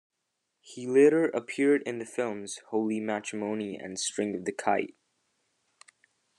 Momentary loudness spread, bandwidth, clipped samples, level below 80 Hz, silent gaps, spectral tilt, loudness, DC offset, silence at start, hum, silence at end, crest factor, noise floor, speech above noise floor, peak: 13 LU; 11 kHz; under 0.1%; -82 dBFS; none; -4.5 dB/octave; -29 LUFS; under 0.1%; 0.65 s; none; 1.45 s; 20 dB; -82 dBFS; 53 dB; -10 dBFS